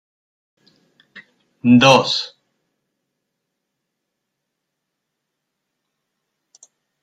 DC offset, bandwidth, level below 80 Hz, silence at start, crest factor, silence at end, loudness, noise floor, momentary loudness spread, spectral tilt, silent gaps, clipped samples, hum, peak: under 0.1%; 11 kHz; -60 dBFS; 1.15 s; 22 dB; 4.75 s; -14 LUFS; -78 dBFS; 13 LU; -4.5 dB/octave; none; under 0.1%; none; 0 dBFS